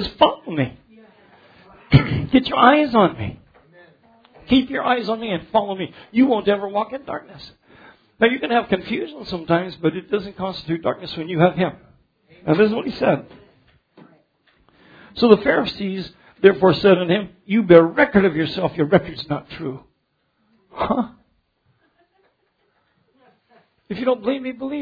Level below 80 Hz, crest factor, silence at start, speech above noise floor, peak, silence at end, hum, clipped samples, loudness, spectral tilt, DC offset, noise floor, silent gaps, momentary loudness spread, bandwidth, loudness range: -48 dBFS; 20 dB; 0 s; 50 dB; 0 dBFS; 0 s; none; under 0.1%; -19 LUFS; -8.5 dB/octave; under 0.1%; -69 dBFS; none; 15 LU; 5 kHz; 13 LU